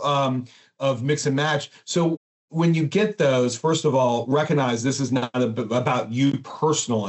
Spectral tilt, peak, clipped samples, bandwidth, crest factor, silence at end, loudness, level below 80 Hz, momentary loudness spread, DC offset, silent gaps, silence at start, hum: -5.5 dB/octave; -6 dBFS; under 0.1%; 8.2 kHz; 16 dB; 0 s; -22 LUFS; -68 dBFS; 5 LU; under 0.1%; 2.17-2.48 s; 0 s; none